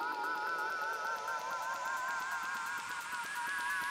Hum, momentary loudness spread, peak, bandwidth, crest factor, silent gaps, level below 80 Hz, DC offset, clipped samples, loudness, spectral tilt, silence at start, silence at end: none; 3 LU; -26 dBFS; 16 kHz; 12 dB; none; -80 dBFS; under 0.1%; under 0.1%; -37 LUFS; -0.5 dB/octave; 0 s; 0 s